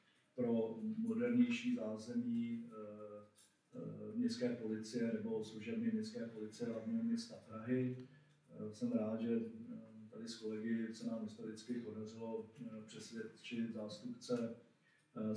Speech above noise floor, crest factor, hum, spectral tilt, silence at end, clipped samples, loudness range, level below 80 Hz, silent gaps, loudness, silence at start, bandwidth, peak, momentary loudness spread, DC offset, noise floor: 31 dB; 20 dB; none; -6.5 dB/octave; 0 s; under 0.1%; 6 LU; under -90 dBFS; none; -43 LUFS; 0.35 s; 10.5 kHz; -24 dBFS; 13 LU; under 0.1%; -73 dBFS